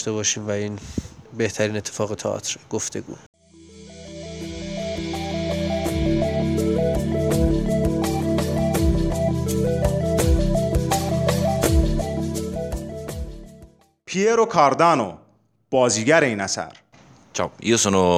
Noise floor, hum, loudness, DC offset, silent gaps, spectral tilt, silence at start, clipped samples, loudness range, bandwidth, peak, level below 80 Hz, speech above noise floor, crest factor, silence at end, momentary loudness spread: -59 dBFS; none; -22 LUFS; under 0.1%; 3.26-3.33 s; -5 dB/octave; 0 s; under 0.1%; 8 LU; 16 kHz; -2 dBFS; -32 dBFS; 38 dB; 20 dB; 0 s; 15 LU